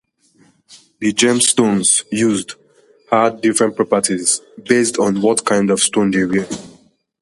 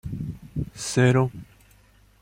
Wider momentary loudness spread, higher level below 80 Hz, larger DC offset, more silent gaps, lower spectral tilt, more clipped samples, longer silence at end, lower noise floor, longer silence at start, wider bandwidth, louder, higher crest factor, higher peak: second, 8 LU vs 14 LU; second, -56 dBFS vs -46 dBFS; neither; neither; second, -3.5 dB/octave vs -6 dB/octave; neither; second, 0.5 s vs 0.8 s; about the same, -54 dBFS vs -56 dBFS; first, 0.7 s vs 0.05 s; second, 12 kHz vs 14.5 kHz; first, -15 LUFS vs -24 LUFS; about the same, 16 dB vs 20 dB; first, 0 dBFS vs -6 dBFS